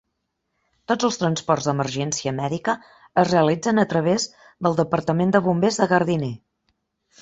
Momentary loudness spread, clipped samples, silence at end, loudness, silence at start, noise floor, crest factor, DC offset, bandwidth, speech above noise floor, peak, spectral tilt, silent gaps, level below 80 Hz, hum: 7 LU; under 0.1%; 0.85 s; -22 LUFS; 0.9 s; -76 dBFS; 20 dB; under 0.1%; 8 kHz; 56 dB; -2 dBFS; -5.5 dB/octave; none; -58 dBFS; none